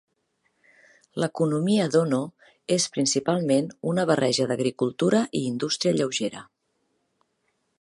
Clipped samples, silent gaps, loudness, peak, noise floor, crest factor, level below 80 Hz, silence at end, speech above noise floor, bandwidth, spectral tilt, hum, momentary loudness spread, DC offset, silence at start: under 0.1%; none; -24 LUFS; -6 dBFS; -73 dBFS; 20 dB; -70 dBFS; 1.35 s; 50 dB; 11.5 kHz; -4.5 dB/octave; none; 7 LU; under 0.1%; 1.15 s